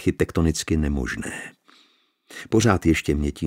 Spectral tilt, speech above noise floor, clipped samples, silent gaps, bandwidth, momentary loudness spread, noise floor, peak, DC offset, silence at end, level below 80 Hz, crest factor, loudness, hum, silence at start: -5.5 dB/octave; 39 dB; under 0.1%; none; 16 kHz; 19 LU; -62 dBFS; -4 dBFS; under 0.1%; 0 s; -34 dBFS; 20 dB; -23 LUFS; none; 0 s